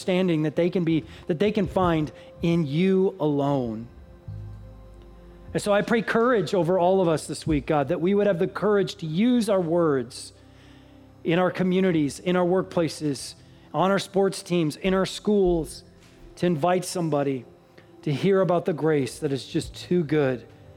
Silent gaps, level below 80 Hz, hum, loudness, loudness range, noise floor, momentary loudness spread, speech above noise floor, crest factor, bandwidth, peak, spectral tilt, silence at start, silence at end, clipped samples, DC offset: none; -50 dBFS; none; -24 LUFS; 3 LU; -51 dBFS; 12 LU; 28 dB; 16 dB; 14.5 kHz; -8 dBFS; -6.5 dB/octave; 0 s; 0.05 s; under 0.1%; under 0.1%